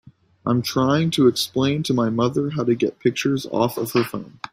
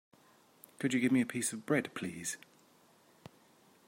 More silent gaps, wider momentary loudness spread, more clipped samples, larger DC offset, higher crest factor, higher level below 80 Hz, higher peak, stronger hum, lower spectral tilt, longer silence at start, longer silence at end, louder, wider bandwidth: neither; second, 5 LU vs 11 LU; neither; neither; about the same, 16 dB vs 18 dB; first, -58 dBFS vs -80 dBFS; first, -4 dBFS vs -18 dBFS; neither; first, -6 dB/octave vs -4.5 dB/octave; second, 0.45 s vs 0.8 s; second, 0.05 s vs 1.5 s; first, -21 LUFS vs -34 LUFS; about the same, 16 kHz vs 16 kHz